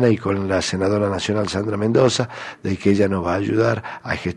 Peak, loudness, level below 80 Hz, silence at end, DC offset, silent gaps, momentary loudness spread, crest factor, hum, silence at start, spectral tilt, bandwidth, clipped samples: -4 dBFS; -20 LUFS; -50 dBFS; 0 s; under 0.1%; none; 9 LU; 14 dB; none; 0 s; -5.5 dB/octave; 11 kHz; under 0.1%